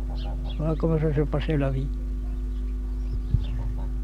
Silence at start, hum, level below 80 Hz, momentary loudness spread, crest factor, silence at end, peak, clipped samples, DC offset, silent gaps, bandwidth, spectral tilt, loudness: 0 s; none; -28 dBFS; 8 LU; 16 dB; 0 s; -10 dBFS; under 0.1%; under 0.1%; none; 5.2 kHz; -9 dB/octave; -28 LUFS